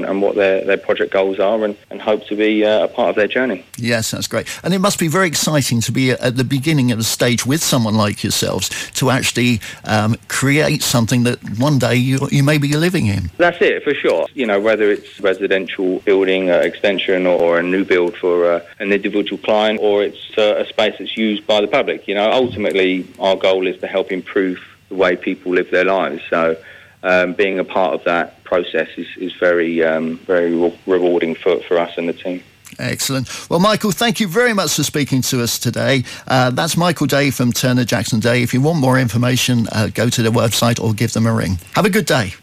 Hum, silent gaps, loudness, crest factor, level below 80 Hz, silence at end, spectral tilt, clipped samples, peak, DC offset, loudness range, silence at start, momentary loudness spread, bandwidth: none; none; -16 LUFS; 12 dB; -50 dBFS; 0.05 s; -4.5 dB/octave; under 0.1%; -4 dBFS; under 0.1%; 2 LU; 0 s; 5 LU; 16 kHz